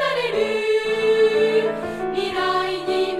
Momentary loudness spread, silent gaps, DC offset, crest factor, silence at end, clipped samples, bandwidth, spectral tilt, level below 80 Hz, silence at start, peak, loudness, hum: 7 LU; none; under 0.1%; 12 dB; 0 s; under 0.1%; 12.5 kHz; -4 dB/octave; -54 dBFS; 0 s; -8 dBFS; -20 LUFS; none